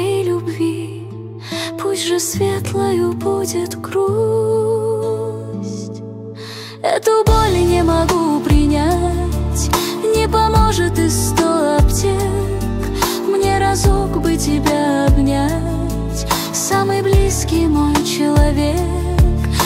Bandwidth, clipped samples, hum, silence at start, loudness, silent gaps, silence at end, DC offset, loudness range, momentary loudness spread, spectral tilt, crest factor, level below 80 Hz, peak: 16 kHz; under 0.1%; none; 0 s; -16 LUFS; none; 0 s; under 0.1%; 4 LU; 10 LU; -5.5 dB/octave; 14 dB; -22 dBFS; -2 dBFS